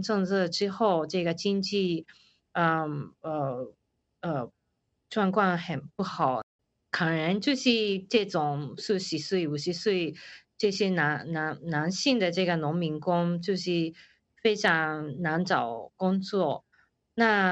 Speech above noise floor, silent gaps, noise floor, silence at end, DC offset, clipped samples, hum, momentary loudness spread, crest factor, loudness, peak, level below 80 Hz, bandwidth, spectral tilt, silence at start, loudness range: 50 dB; 6.43-6.59 s; -78 dBFS; 0 s; under 0.1%; under 0.1%; none; 10 LU; 20 dB; -28 LUFS; -8 dBFS; -70 dBFS; 8.2 kHz; -5.5 dB/octave; 0 s; 4 LU